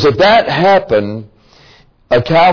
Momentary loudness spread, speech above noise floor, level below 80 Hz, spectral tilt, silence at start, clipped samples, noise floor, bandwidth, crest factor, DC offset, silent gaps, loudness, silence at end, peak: 11 LU; 35 dB; -42 dBFS; -6 dB/octave; 0 s; under 0.1%; -45 dBFS; 5.4 kHz; 12 dB; under 0.1%; none; -11 LUFS; 0 s; 0 dBFS